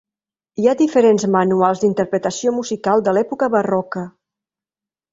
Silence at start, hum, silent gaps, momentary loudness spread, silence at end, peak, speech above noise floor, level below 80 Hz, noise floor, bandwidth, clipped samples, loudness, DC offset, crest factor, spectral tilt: 0.6 s; none; none; 9 LU; 1.05 s; -2 dBFS; over 74 dB; -62 dBFS; under -90 dBFS; 7.8 kHz; under 0.1%; -17 LUFS; under 0.1%; 16 dB; -6 dB/octave